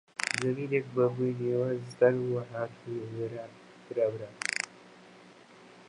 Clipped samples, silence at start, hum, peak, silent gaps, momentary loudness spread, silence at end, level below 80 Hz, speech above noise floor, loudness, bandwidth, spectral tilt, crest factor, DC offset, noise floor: under 0.1%; 0.2 s; 60 Hz at -55 dBFS; -12 dBFS; none; 12 LU; 0.05 s; -74 dBFS; 24 dB; -31 LUFS; 11.5 kHz; -5.5 dB/octave; 20 dB; under 0.1%; -54 dBFS